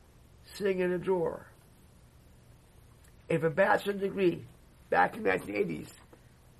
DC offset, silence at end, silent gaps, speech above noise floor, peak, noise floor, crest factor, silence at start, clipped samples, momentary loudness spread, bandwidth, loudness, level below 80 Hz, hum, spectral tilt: under 0.1%; 0.65 s; none; 28 dB; -12 dBFS; -58 dBFS; 20 dB; 0.5 s; under 0.1%; 15 LU; 13 kHz; -30 LUFS; -62 dBFS; none; -6.5 dB/octave